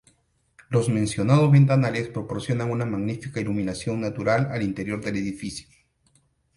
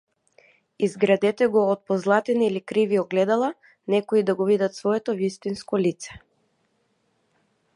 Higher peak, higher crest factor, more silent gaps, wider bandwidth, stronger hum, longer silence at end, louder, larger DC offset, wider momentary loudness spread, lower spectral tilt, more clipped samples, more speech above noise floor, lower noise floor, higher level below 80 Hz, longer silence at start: about the same, -6 dBFS vs -6 dBFS; about the same, 18 dB vs 18 dB; neither; about the same, 11.5 kHz vs 11 kHz; neither; second, 0.95 s vs 1.6 s; about the same, -24 LUFS vs -23 LUFS; neither; first, 13 LU vs 7 LU; about the same, -7 dB/octave vs -6 dB/octave; neither; second, 42 dB vs 47 dB; second, -65 dBFS vs -69 dBFS; first, -54 dBFS vs -66 dBFS; about the same, 0.7 s vs 0.8 s